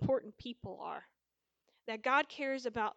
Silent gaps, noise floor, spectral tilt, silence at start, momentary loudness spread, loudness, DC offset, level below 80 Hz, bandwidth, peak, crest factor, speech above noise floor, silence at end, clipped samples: none; -88 dBFS; -5.5 dB/octave; 0 s; 16 LU; -37 LUFS; under 0.1%; -70 dBFS; 8 kHz; -18 dBFS; 20 dB; 51 dB; 0.05 s; under 0.1%